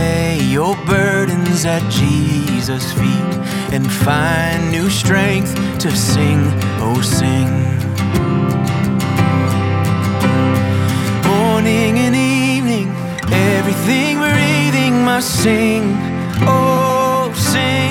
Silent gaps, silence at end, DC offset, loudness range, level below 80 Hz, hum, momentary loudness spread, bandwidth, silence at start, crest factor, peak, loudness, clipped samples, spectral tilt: none; 0 s; under 0.1%; 2 LU; -40 dBFS; none; 4 LU; 17.5 kHz; 0 s; 14 dB; 0 dBFS; -15 LUFS; under 0.1%; -5.5 dB/octave